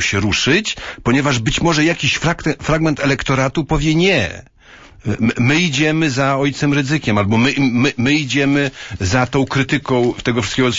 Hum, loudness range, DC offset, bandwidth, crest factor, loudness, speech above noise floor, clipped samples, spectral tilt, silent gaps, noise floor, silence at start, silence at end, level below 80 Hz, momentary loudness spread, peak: none; 2 LU; under 0.1%; 8 kHz; 14 dB; -16 LUFS; 26 dB; under 0.1%; -5 dB/octave; none; -42 dBFS; 0 s; 0 s; -36 dBFS; 5 LU; -2 dBFS